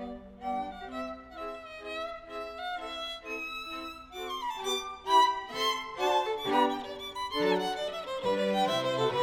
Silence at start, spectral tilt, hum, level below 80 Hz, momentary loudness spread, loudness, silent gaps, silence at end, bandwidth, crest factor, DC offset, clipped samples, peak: 0 s; -3.5 dB/octave; none; -60 dBFS; 13 LU; -32 LUFS; none; 0 s; 18 kHz; 20 dB; under 0.1%; under 0.1%; -12 dBFS